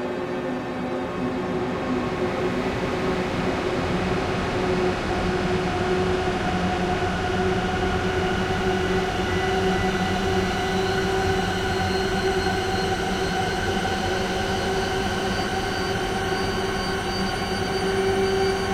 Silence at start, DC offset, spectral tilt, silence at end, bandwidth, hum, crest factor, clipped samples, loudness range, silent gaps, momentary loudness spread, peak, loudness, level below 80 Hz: 0 s; under 0.1%; -5 dB/octave; 0 s; 16 kHz; none; 14 dB; under 0.1%; 2 LU; none; 3 LU; -10 dBFS; -24 LUFS; -38 dBFS